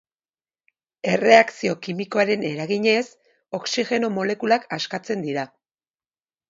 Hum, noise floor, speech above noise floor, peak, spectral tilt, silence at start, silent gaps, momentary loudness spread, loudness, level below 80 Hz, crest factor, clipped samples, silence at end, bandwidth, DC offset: none; under -90 dBFS; over 69 dB; 0 dBFS; -4.5 dB/octave; 1.05 s; none; 15 LU; -21 LUFS; -70 dBFS; 22 dB; under 0.1%; 1.05 s; 7.8 kHz; under 0.1%